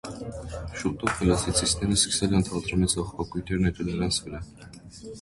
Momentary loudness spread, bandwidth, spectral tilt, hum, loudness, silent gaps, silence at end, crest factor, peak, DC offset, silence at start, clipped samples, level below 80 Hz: 18 LU; 11.5 kHz; -4 dB/octave; none; -26 LUFS; none; 0 s; 20 dB; -6 dBFS; under 0.1%; 0.05 s; under 0.1%; -40 dBFS